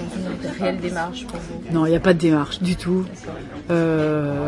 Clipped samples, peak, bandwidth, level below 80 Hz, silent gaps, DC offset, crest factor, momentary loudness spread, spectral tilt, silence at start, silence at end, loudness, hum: under 0.1%; -4 dBFS; 11.5 kHz; -44 dBFS; none; under 0.1%; 18 dB; 15 LU; -7 dB/octave; 0 s; 0 s; -22 LUFS; none